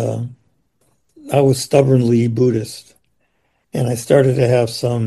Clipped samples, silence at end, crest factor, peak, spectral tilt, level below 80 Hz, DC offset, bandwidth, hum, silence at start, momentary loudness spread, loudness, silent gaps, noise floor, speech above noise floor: under 0.1%; 0 s; 16 dB; 0 dBFS; -6.5 dB/octave; -54 dBFS; under 0.1%; 12.5 kHz; none; 0 s; 14 LU; -16 LUFS; none; -65 dBFS; 50 dB